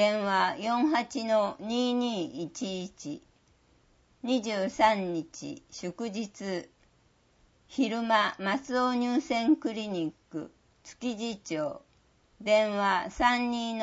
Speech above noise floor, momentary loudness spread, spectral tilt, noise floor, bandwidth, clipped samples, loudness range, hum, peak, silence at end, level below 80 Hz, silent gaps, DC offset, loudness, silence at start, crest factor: 37 dB; 15 LU; -4.5 dB/octave; -66 dBFS; 8 kHz; under 0.1%; 4 LU; none; -10 dBFS; 0 s; -62 dBFS; none; under 0.1%; -29 LUFS; 0 s; 20 dB